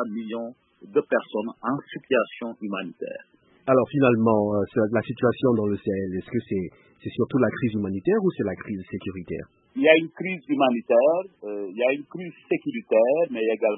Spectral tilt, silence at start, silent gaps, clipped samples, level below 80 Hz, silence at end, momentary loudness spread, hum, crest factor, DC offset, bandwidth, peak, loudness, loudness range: -11 dB/octave; 0 s; none; under 0.1%; -62 dBFS; 0 s; 15 LU; none; 22 dB; under 0.1%; 4 kHz; -2 dBFS; -24 LUFS; 4 LU